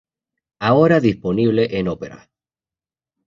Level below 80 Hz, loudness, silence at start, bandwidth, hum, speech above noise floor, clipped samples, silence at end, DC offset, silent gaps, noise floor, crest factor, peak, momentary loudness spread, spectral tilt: -50 dBFS; -17 LUFS; 0.6 s; 7.2 kHz; none; over 73 dB; under 0.1%; 1.1 s; under 0.1%; none; under -90 dBFS; 18 dB; -2 dBFS; 13 LU; -8 dB/octave